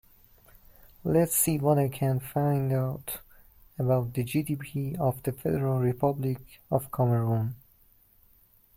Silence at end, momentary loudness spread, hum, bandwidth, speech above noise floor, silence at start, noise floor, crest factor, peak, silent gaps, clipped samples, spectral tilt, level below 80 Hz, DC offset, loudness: 1.2 s; 12 LU; none; 16.5 kHz; 34 dB; 1.05 s; -61 dBFS; 20 dB; -10 dBFS; none; under 0.1%; -6.5 dB/octave; -56 dBFS; under 0.1%; -28 LUFS